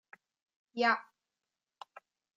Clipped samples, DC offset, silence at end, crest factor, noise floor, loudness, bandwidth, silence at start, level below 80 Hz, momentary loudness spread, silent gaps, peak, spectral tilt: under 0.1%; under 0.1%; 1.35 s; 22 dB; under -90 dBFS; -31 LUFS; 7.8 kHz; 0.75 s; under -90 dBFS; 24 LU; none; -18 dBFS; -3.5 dB/octave